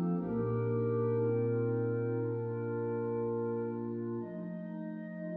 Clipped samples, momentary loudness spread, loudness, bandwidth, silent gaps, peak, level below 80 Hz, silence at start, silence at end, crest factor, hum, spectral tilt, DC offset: under 0.1%; 10 LU; -35 LUFS; 2.8 kHz; none; -22 dBFS; -68 dBFS; 0 s; 0 s; 12 dB; none; -11.5 dB/octave; under 0.1%